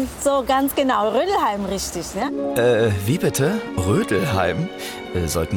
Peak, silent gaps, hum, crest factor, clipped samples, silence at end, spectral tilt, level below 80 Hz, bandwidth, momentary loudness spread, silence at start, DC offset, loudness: -6 dBFS; none; none; 14 dB; under 0.1%; 0 s; -5 dB/octave; -42 dBFS; 18 kHz; 7 LU; 0 s; under 0.1%; -21 LUFS